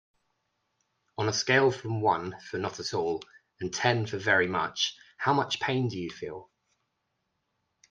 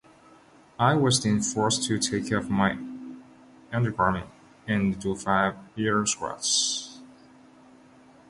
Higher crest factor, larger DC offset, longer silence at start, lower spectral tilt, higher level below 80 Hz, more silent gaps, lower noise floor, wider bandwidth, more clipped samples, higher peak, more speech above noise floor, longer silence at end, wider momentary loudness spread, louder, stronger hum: about the same, 22 dB vs 20 dB; neither; first, 1.2 s vs 0.8 s; about the same, -4 dB/octave vs -4 dB/octave; second, -70 dBFS vs -54 dBFS; neither; first, -80 dBFS vs -55 dBFS; second, 9.6 kHz vs 11.5 kHz; neither; about the same, -8 dBFS vs -6 dBFS; first, 51 dB vs 29 dB; first, 1.45 s vs 1.2 s; about the same, 13 LU vs 13 LU; second, -28 LUFS vs -25 LUFS; neither